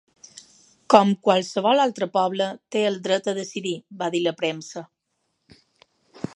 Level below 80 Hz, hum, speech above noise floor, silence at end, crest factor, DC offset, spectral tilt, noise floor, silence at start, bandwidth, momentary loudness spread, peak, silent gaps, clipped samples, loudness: -70 dBFS; none; 53 dB; 1.5 s; 24 dB; under 0.1%; -4.5 dB/octave; -75 dBFS; 0.9 s; 11.5 kHz; 13 LU; 0 dBFS; none; under 0.1%; -22 LUFS